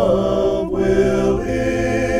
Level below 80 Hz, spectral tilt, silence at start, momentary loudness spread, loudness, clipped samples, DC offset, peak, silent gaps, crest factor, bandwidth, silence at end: -32 dBFS; -6.5 dB/octave; 0 s; 3 LU; -18 LUFS; under 0.1%; under 0.1%; -4 dBFS; none; 14 dB; 13 kHz; 0 s